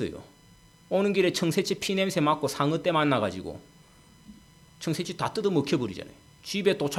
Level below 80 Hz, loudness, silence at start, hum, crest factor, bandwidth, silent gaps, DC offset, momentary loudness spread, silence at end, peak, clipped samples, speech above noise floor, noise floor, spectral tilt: -62 dBFS; -27 LUFS; 0 s; none; 18 dB; 16.5 kHz; none; under 0.1%; 16 LU; 0 s; -10 dBFS; under 0.1%; 29 dB; -56 dBFS; -5 dB/octave